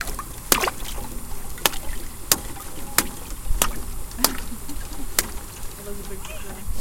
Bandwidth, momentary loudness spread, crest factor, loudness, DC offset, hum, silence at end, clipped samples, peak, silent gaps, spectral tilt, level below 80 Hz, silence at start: 17 kHz; 14 LU; 26 dB; -26 LUFS; under 0.1%; none; 0 s; under 0.1%; 0 dBFS; none; -1.5 dB/octave; -32 dBFS; 0 s